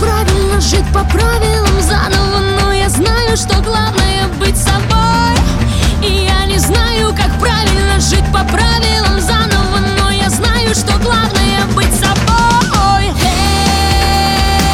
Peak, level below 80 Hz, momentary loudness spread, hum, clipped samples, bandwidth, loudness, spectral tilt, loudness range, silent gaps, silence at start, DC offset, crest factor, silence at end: 0 dBFS; -16 dBFS; 2 LU; none; under 0.1%; 16.5 kHz; -11 LUFS; -4 dB/octave; 1 LU; none; 0 s; 0.2%; 10 dB; 0 s